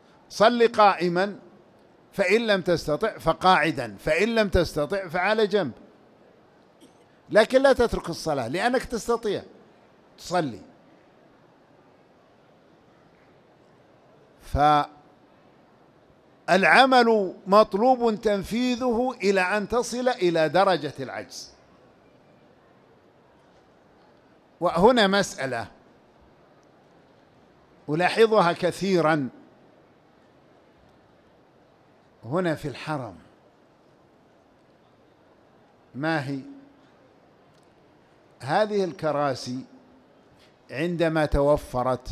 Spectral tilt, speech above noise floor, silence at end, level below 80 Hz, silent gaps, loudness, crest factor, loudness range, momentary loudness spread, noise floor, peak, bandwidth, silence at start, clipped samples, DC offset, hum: -5 dB/octave; 35 dB; 0 s; -46 dBFS; none; -23 LUFS; 22 dB; 14 LU; 16 LU; -58 dBFS; -4 dBFS; 15 kHz; 0.3 s; under 0.1%; under 0.1%; none